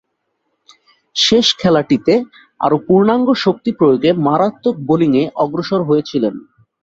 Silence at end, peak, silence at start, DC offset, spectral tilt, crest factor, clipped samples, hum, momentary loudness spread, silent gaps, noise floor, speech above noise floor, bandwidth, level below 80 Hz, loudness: 0.45 s; 0 dBFS; 1.15 s; under 0.1%; -5.5 dB/octave; 14 dB; under 0.1%; none; 8 LU; none; -70 dBFS; 56 dB; 8 kHz; -54 dBFS; -14 LUFS